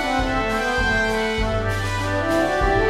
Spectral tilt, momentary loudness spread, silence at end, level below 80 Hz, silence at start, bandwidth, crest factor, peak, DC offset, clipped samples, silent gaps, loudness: -5 dB/octave; 4 LU; 0 s; -30 dBFS; 0 s; 15.5 kHz; 14 dB; -8 dBFS; under 0.1%; under 0.1%; none; -21 LUFS